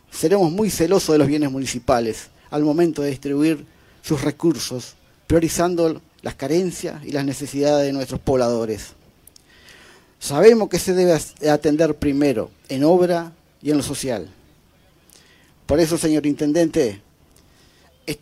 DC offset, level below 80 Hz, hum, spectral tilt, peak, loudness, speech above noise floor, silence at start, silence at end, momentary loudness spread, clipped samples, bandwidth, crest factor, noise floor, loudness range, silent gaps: under 0.1%; -46 dBFS; none; -5.5 dB/octave; 0 dBFS; -20 LUFS; 36 dB; 0.15 s; 0.05 s; 13 LU; under 0.1%; 16 kHz; 20 dB; -55 dBFS; 5 LU; none